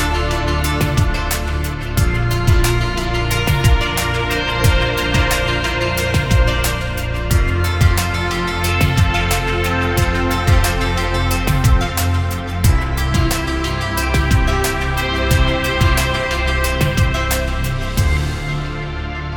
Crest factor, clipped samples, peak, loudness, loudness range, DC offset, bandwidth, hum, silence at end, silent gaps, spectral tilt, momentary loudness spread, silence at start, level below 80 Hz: 16 dB; under 0.1%; 0 dBFS; -17 LUFS; 1 LU; under 0.1%; 19 kHz; none; 0 s; none; -5 dB/octave; 5 LU; 0 s; -20 dBFS